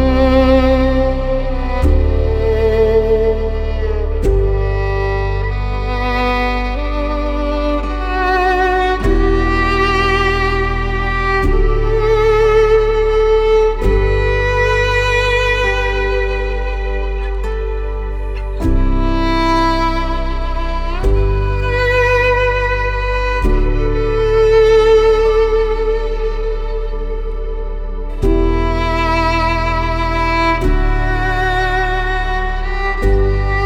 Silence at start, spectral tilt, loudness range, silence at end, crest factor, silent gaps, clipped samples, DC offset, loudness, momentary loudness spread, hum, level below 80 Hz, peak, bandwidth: 0 s; -6.5 dB/octave; 5 LU; 0 s; 14 dB; none; under 0.1%; under 0.1%; -15 LUFS; 9 LU; none; -18 dBFS; 0 dBFS; 8 kHz